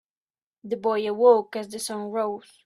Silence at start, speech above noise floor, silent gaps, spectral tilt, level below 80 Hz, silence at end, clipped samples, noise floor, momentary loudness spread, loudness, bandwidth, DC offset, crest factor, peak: 0.65 s; over 66 dB; none; -4 dB/octave; -74 dBFS; 0.25 s; under 0.1%; under -90 dBFS; 13 LU; -24 LUFS; 13.5 kHz; under 0.1%; 20 dB; -6 dBFS